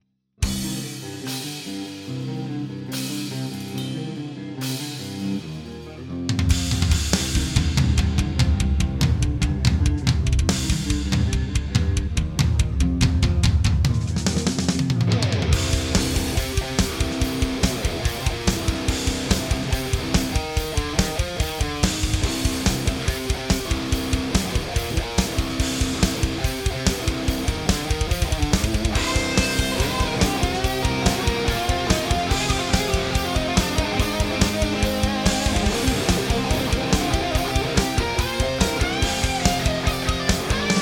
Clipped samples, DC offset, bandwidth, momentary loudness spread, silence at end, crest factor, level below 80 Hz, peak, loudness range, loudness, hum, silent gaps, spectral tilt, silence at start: under 0.1%; under 0.1%; 18.5 kHz; 8 LU; 0 s; 22 dB; -28 dBFS; 0 dBFS; 6 LU; -23 LUFS; none; none; -4.5 dB/octave; 0.4 s